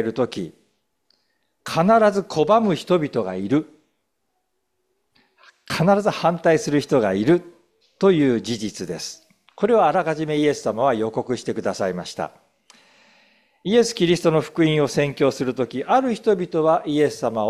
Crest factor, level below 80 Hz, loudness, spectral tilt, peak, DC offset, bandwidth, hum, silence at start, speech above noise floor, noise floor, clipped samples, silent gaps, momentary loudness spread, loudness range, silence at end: 16 dB; -58 dBFS; -20 LUFS; -6 dB/octave; -4 dBFS; under 0.1%; 14 kHz; none; 0 s; 55 dB; -75 dBFS; under 0.1%; none; 11 LU; 5 LU; 0 s